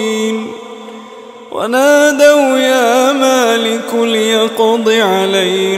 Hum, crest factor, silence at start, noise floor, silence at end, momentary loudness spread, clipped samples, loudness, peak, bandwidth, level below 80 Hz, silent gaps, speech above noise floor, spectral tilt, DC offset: none; 12 dB; 0 s; -32 dBFS; 0 s; 18 LU; under 0.1%; -11 LUFS; 0 dBFS; 16.5 kHz; -68 dBFS; none; 22 dB; -3 dB/octave; under 0.1%